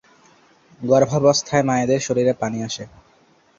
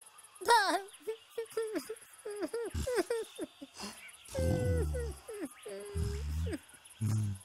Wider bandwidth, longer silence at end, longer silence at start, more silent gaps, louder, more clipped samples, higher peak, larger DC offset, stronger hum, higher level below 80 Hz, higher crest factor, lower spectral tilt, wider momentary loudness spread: second, 7.8 kHz vs 16 kHz; first, 0.7 s vs 0 s; first, 0.8 s vs 0.05 s; neither; first, -19 LUFS vs -36 LUFS; neither; first, -2 dBFS vs -10 dBFS; neither; neither; second, -56 dBFS vs -46 dBFS; second, 18 dB vs 26 dB; about the same, -5 dB/octave vs -5 dB/octave; about the same, 14 LU vs 15 LU